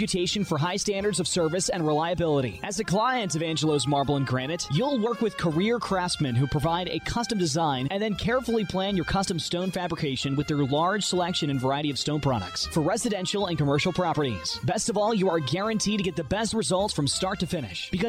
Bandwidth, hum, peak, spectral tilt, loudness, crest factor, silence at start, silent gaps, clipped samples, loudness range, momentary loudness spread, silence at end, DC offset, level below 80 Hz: 15.5 kHz; none; -14 dBFS; -4.5 dB/octave; -26 LUFS; 12 dB; 0 s; none; under 0.1%; 1 LU; 4 LU; 0 s; under 0.1%; -48 dBFS